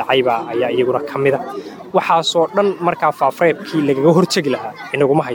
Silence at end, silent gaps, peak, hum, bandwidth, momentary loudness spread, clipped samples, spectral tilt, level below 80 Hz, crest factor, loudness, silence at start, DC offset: 0 s; none; -2 dBFS; none; 19.5 kHz; 8 LU; under 0.1%; -5.5 dB/octave; -62 dBFS; 14 dB; -16 LUFS; 0 s; under 0.1%